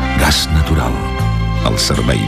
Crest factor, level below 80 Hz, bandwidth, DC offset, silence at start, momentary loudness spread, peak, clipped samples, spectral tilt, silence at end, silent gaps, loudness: 12 dB; -20 dBFS; 15.5 kHz; under 0.1%; 0 s; 5 LU; -2 dBFS; under 0.1%; -4.5 dB/octave; 0 s; none; -15 LUFS